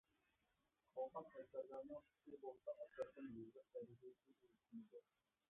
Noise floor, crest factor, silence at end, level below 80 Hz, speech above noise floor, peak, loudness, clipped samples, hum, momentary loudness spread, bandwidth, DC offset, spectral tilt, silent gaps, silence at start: -88 dBFS; 20 dB; 0.5 s; -90 dBFS; 31 dB; -38 dBFS; -56 LUFS; under 0.1%; none; 12 LU; 3.7 kHz; under 0.1%; -3.5 dB/octave; none; 0.95 s